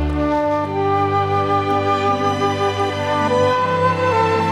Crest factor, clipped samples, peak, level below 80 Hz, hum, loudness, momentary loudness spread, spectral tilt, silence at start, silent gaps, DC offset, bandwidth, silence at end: 12 dB; under 0.1%; -4 dBFS; -34 dBFS; 50 Hz at -50 dBFS; -18 LUFS; 3 LU; -6 dB/octave; 0 s; none; under 0.1%; 14 kHz; 0 s